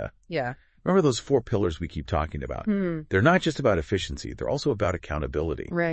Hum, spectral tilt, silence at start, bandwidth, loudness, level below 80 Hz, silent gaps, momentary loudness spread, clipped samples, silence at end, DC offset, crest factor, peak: none; -6 dB/octave; 0 s; 8.8 kHz; -26 LUFS; -42 dBFS; none; 10 LU; under 0.1%; 0 s; under 0.1%; 20 dB; -4 dBFS